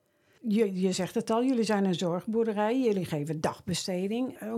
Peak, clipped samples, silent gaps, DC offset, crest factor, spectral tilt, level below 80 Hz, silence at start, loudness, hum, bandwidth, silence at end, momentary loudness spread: -14 dBFS; under 0.1%; none; under 0.1%; 16 dB; -5.5 dB/octave; -70 dBFS; 0.45 s; -29 LUFS; none; 15.5 kHz; 0 s; 6 LU